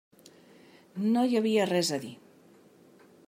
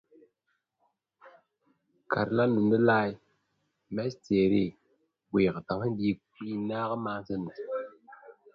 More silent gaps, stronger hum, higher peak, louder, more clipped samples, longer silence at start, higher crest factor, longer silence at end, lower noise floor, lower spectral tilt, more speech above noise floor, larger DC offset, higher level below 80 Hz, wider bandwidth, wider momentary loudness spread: neither; neither; about the same, -14 dBFS vs -12 dBFS; about the same, -27 LUFS vs -29 LUFS; neither; second, 0.95 s vs 1.25 s; about the same, 18 dB vs 20 dB; first, 1.1 s vs 0.25 s; second, -58 dBFS vs -79 dBFS; second, -4.5 dB/octave vs -8.5 dB/octave; second, 31 dB vs 52 dB; neither; second, -82 dBFS vs -62 dBFS; first, 16 kHz vs 6.8 kHz; first, 16 LU vs 13 LU